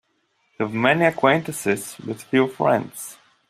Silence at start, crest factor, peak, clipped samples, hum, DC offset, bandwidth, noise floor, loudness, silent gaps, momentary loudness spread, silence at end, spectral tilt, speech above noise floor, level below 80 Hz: 0.6 s; 20 dB; -2 dBFS; under 0.1%; none; under 0.1%; 15.5 kHz; -68 dBFS; -21 LUFS; none; 16 LU; 0.35 s; -5 dB/octave; 47 dB; -64 dBFS